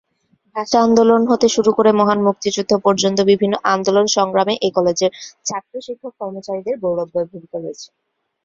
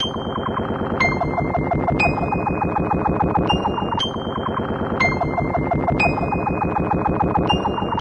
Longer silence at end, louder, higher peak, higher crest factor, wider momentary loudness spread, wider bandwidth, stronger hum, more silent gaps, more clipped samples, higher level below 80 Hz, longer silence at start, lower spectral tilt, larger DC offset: first, 0.6 s vs 0 s; first, -16 LUFS vs -21 LUFS; first, 0 dBFS vs -6 dBFS; about the same, 16 dB vs 14 dB; first, 15 LU vs 5 LU; second, 7.6 kHz vs 10 kHz; neither; neither; neither; second, -58 dBFS vs -34 dBFS; first, 0.55 s vs 0 s; second, -4.5 dB/octave vs -6.5 dB/octave; neither